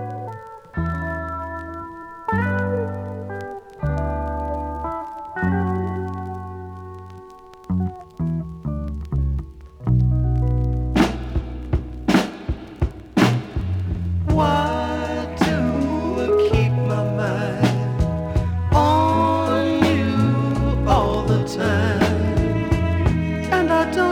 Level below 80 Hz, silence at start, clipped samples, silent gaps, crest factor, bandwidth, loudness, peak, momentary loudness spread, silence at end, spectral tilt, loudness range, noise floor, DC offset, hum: -30 dBFS; 0 s; under 0.1%; none; 18 dB; 16 kHz; -21 LUFS; -2 dBFS; 13 LU; 0 s; -7 dB/octave; 8 LU; -42 dBFS; under 0.1%; none